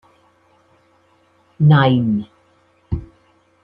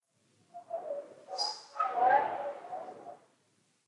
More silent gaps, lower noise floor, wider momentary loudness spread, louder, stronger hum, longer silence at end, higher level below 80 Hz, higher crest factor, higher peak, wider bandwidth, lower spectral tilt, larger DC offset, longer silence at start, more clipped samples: neither; second, -57 dBFS vs -73 dBFS; second, 16 LU vs 24 LU; first, -17 LUFS vs -33 LUFS; neither; about the same, 0.6 s vs 0.7 s; first, -42 dBFS vs under -90 dBFS; about the same, 18 dB vs 20 dB; first, -2 dBFS vs -14 dBFS; second, 4.5 kHz vs 11 kHz; first, -10 dB/octave vs -1.5 dB/octave; neither; first, 1.6 s vs 0.55 s; neither